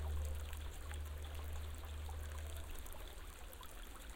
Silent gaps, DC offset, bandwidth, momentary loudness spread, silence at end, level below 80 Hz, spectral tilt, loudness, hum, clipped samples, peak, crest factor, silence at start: none; under 0.1%; 17 kHz; 8 LU; 0 s; -48 dBFS; -4.5 dB/octave; -49 LUFS; none; under 0.1%; -32 dBFS; 14 dB; 0 s